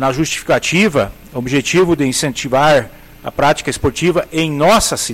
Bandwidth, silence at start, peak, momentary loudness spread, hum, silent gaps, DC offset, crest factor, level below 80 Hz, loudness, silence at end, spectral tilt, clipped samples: 16.5 kHz; 0 s; -4 dBFS; 8 LU; none; none; under 0.1%; 12 dB; -38 dBFS; -14 LUFS; 0 s; -4 dB/octave; under 0.1%